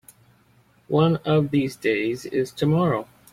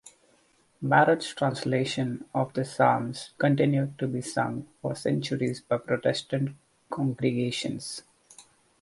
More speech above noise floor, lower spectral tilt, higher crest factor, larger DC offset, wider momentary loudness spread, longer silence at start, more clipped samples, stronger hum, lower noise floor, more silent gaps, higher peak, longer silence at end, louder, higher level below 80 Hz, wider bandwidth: about the same, 37 dB vs 38 dB; about the same, -7 dB/octave vs -6 dB/octave; about the same, 18 dB vs 22 dB; neither; second, 6 LU vs 11 LU; first, 0.9 s vs 0.05 s; neither; neither; second, -59 dBFS vs -65 dBFS; neither; about the same, -6 dBFS vs -6 dBFS; about the same, 0.3 s vs 0.4 s; first, -23 LUFS vs -28 LUFS; first, -58 dBFS vs -66 dBFS; first, 15.5 kHz vs 11.5 kHz